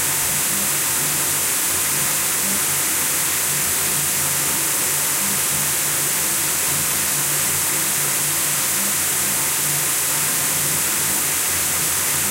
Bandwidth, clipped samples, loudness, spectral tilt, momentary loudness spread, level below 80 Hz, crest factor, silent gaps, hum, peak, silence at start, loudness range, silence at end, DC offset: 16 kHz; under 0.1%; -17 LUFS; -0.5 dB/octave; 0 LU; -52 dBFS; 14 dB; none; none; -6 dBFS; 0 s; 0 LU; 0 s; under 0.1%